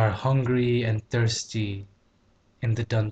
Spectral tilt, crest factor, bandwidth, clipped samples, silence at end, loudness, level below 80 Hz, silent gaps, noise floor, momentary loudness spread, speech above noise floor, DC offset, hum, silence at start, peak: -6 dB/octave; 14 dB; 8.4 kHz; under 0.1%; 0 s; -26 LUFS; -52 dBFS; none; -63 dBFS; 9 LU; 38 dB; under 0.1%; none; 0 s; -10 dBFS